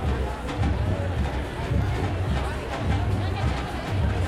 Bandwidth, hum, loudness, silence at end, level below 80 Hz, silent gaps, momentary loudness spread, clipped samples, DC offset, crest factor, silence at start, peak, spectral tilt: 12.5 kHz; none; -27 LUFS; 0 s; -30 dBFS; none; 4 LU; under 0.1%; under 0.1%; 12 dB; 0 s; -12 dBFS; -7 dB/octave